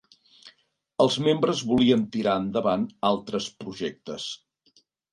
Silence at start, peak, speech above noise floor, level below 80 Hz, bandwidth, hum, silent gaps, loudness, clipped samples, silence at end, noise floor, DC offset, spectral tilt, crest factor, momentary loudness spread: 0.45 s; -6 dBFS; 40 dB; -60 dBFS; 11.5 kHz; none; none; -25 LUFS; under 0.1%; 0.75 s; -64 dBFS; under 0.1%; -5.5 dB/octave; 20 dB; 13 LU